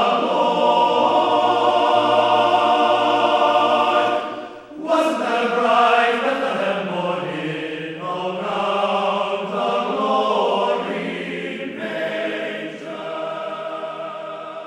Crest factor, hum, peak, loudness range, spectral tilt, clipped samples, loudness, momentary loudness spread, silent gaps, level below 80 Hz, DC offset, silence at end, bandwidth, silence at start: 16 dB; none; -4 dBFS; 8 LU; -4.5 dB/octave; under 0.1%; -19 LUFS; 12 LU; none; -66 dBFS; under 0.1%; 0 s; 12 kHz; 0 s